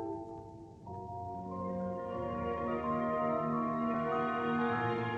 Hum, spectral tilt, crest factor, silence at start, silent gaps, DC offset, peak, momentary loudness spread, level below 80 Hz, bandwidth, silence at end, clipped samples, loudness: none; -8.5 dB/octave; 14 dB; 0 s; none; under 0.1%; -20 dBFS; 14 LU; -60 dBFS; 7.4 kHz; 0 s; under 0.1%; -35 LUFS